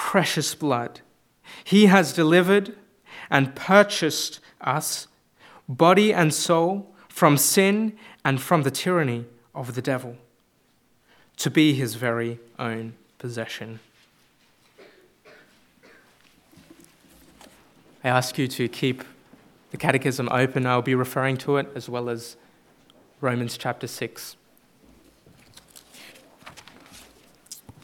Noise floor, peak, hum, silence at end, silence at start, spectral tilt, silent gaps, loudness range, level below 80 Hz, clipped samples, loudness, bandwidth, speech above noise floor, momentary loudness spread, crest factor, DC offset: -64 dBFS; 0 dBFS; none; 0.15 s; 0 s; -4.5 dB/octave; none; 14 LU; -70 dBFS; under 0.1%; -22 LUFS; 17.5 kHz; 42 dB; 22 LU; 24 dB; under 0.1%